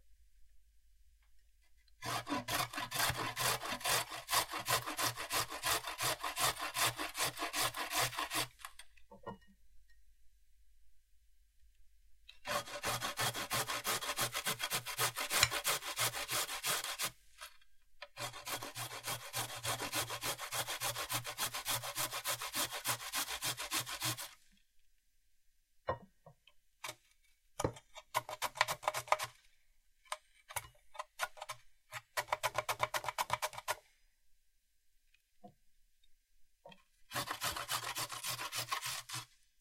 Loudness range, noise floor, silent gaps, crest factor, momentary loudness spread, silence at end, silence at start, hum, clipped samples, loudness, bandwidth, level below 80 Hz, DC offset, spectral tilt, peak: 11 LU; -72 dBFS; none; 30 dB; 14 LU; 0.35 s; 0.05 s; none; under 0.1%; -37 LUFS; 16.5 kHz; -66 dBFS; under 0.1%; -1 dB/octave; -10 dBFS